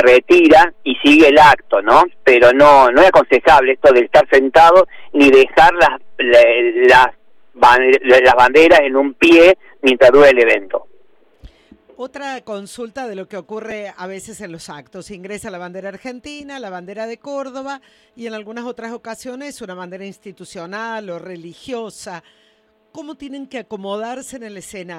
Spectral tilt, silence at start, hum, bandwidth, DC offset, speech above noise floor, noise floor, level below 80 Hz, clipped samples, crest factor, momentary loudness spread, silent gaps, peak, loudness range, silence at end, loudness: -4 dB/octave; 0 s; none; 15.5 kHz; under 0.1%; 45 dB; -57 dBFS; -44 dBFS; under 0.1%; 14 dB; 23 LU; none; 0 dBFS; 21 LU; 0 s; -10 LUFS